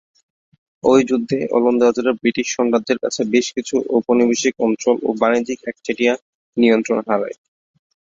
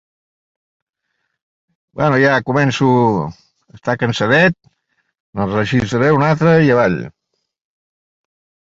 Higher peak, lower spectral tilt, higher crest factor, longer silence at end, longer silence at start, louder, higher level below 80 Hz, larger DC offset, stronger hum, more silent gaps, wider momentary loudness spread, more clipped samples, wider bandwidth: about the same, -2 dBFS vs 0 dBFS; second, -4 dB/octave vs -7 dB/octave; about the same, 16 dB vs 16 dB; second, 0.7 s vs 1.65 s; second, 0.85 s vs 1.95 s; second, -18 LUFS vs -14 LUFS; second, -60 dBFS vs -48 dBFS; neither; neither; first, 6.22-6.53 s vs 5.20-5.33 s; second, 7 LU vs 15 LU; neither; about the same, 7.8 kHz vs 7.8 kHz